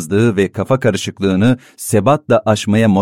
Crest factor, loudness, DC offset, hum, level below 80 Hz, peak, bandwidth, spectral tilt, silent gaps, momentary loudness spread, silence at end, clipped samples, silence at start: 12 dB; -15 LUFS; 0.3%; none; -48 dBFS; -2 dBFS; 16 kHz; -6 dB/octave; none; 4 LU; 0 s; under 0.1%; 0 s